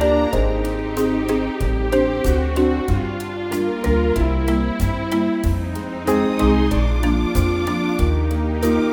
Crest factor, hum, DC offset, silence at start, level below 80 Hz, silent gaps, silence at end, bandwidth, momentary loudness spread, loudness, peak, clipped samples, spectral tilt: 14 dB; none; under 0.1%; 0 s; -22 dBFS; none; 0 s; 19 kHz; 5 LU; -20 LUFS; -4 dBFS; under 0.1%; -7 dB/octave